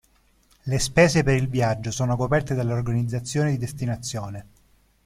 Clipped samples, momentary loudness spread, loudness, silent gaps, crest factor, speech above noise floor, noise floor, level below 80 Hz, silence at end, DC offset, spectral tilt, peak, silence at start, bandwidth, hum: under 0.1%; 13 LU; -23 LUFS; none; 20 dB; 38 dB; -61 dBFS; -44 dBFS; 0.65 s; under 0.1%; -5.5 dB/octave; -4 dBFS; 0.65 s; 15 kHz; none